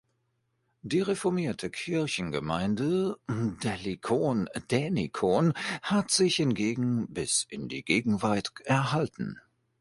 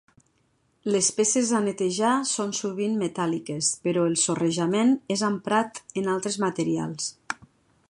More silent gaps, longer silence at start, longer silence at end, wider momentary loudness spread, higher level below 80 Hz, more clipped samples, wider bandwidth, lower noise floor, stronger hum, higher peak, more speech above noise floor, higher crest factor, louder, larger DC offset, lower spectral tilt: neither; about the same, 0.85 s vs 0.85 s; second, 0.4 s vs 0.55 s; about the same, 8 LU vs 9 LU; first, -58 dBFS vs -68 dBFS; neither; about the same, 11.5 kHz vs 11.5 kHz; first, -76 dBFS vs -68 dBFS; neither; about the same, -10 dBFS vs -8 dBFS; first, 47 dB vs 43 dB; about the same, 20 dB vs 18 dB; second, -29 LUFS vs -25 LUFS; neither; about the same, -4.5 dB/octave vs -4 dB/octave